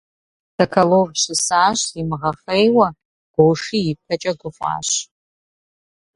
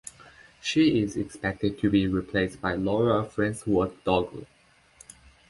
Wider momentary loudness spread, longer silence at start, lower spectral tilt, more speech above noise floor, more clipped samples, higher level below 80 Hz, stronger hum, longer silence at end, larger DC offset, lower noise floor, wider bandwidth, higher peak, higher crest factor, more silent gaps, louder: about the same, 10 LU vs 8 LU; first, 0.6 s vs 0.05 s; second, -4 dB/octave vs -6 dB/octave; first, over 72 dB vs 31 dB; neither; about the same, -54 dBFS vs -50 dBFS; neither; about the same, 1.1 s vs 1.05 s; neither; first, under -90 dBFS vs -56 dBFS; about the same, 11.5 kHz vs 11.5 kHz; first, 0 dBFS vs -8 dBFS; about the same, 20 dB vs 18 dB; first, 3.05-3.34 s vs none; first, -18 LUFS vs -26 LUFS